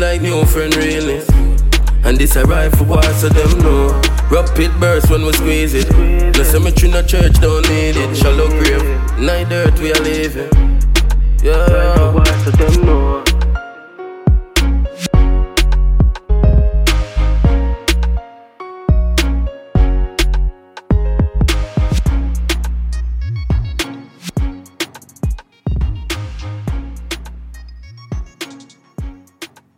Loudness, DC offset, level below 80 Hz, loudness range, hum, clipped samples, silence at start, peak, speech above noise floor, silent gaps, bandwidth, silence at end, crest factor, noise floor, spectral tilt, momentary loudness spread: -14 LUFS; under 0.1%; -14 dBFS; 11 LU; none; under 0.1%; 0 s; 0 dBFS; 29 dB; none; 17 kHz; 0.3 s; 12 dB; -39 dBFS; -5.5 dB/octave; 14 LU